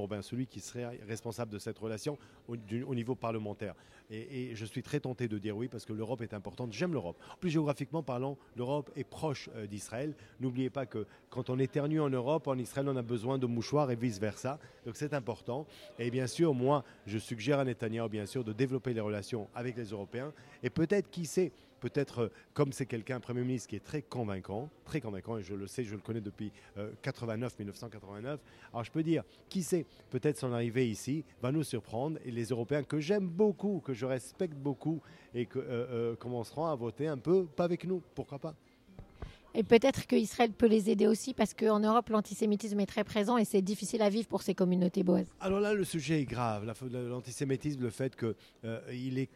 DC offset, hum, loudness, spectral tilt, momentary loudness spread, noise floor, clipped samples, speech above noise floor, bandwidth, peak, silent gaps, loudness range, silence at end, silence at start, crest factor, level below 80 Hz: under 0.1%; none; -35 LUFS; -6.5 dB/octave; 12 LU; -55 dBFS; under 0.1%; 21 dB; 15.5 kHz; -12 dBFS; none; 9 LU; 0.1 s; 0 s; 22 dB; -66 dBFS